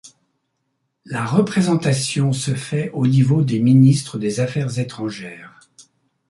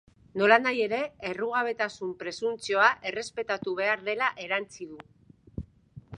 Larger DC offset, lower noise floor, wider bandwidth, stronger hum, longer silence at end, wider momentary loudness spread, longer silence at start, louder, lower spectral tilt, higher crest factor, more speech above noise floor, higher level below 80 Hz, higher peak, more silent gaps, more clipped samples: neither; first, -72 dBFS vs -51 dBFS; about the same, 11.5 kHz vs 11 kHz; neither; first, 0.8 s vs 0 s; second, 14 LU vs 21 LU; second, 0.05 s vs 0.35 s; first, -18 LUFS vs -27 LUFS; first, -6.5 dB/octave vs -4 dB/octave; second, 16 dB vs 24 dB; first, 55 dB vs 23 dB; about the same, -56 dBFS vs -58 dBFS; about the same, -2 dBFS vs -4 dBFS; neither; neither